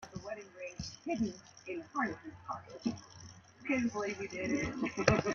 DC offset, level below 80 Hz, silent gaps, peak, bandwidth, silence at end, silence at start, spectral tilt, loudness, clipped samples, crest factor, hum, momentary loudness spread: under 0.1%; -58 dBFS; none; -8 dBFS; 7.2 kHz; 0 s; 0 s; -5 dB/octave; -37 LUFS; under 0.1%; 28 dB; none; 14 LU